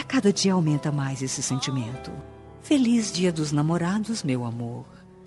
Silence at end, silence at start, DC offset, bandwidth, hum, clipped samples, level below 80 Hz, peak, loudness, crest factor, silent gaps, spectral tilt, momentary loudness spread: 0 s; 0 s; under 0.1%; 11.5 kHz; none; under 0.1%; -56 dBFS; -8 dBFS; -25 LUFS; 16 dB; none; -5 dB/octave; 16 LU